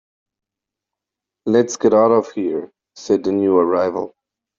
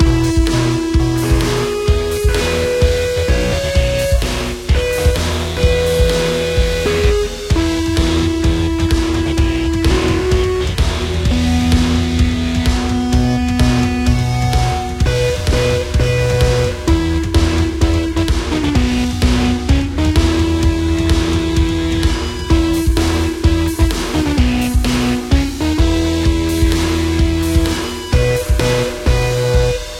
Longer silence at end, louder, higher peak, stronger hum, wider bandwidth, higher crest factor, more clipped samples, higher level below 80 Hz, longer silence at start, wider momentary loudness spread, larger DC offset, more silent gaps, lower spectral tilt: first, 0.5 s vs 0 s; about the same, -17 LUFS vs -15 LUFS; about the same, -2 dBFS vs 0 dBFS; neither; second, 7.6 kHz vs 16 kHz; about the same, 16 dB vs 14 dB; neither; second, -62 dBFS vs -20 dBFS; first, 1.45 s vs 0 s; first, 14 LU vs 3 LU; neither; neither; about the same, -6 dB/octave vs -5.5 dB/octave